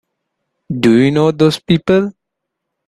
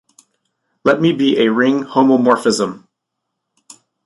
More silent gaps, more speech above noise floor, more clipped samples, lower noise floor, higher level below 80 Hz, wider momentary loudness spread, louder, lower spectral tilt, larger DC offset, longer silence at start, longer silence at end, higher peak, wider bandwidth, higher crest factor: neither; about the same, 65 dB vs 63 dB; neither; about the same, -77 dBFS vs -77 dBFS; first, -50 dBFS vs -62 dBFS; about the same, 8 LU vs 7 LU; about the same, -13 LUFS vs -15 LUFS; first, -7 dB/octave vs -5 dB/octave; neither; second, 0.7 s vs 0.85 s; second, 0.75 s vs 1.25 s; about the same, 0 dBFS vs -2 dBFS; about the same, 12.5 kHz vs 11.5 kHz; about the same, 14 dB vs 16 dB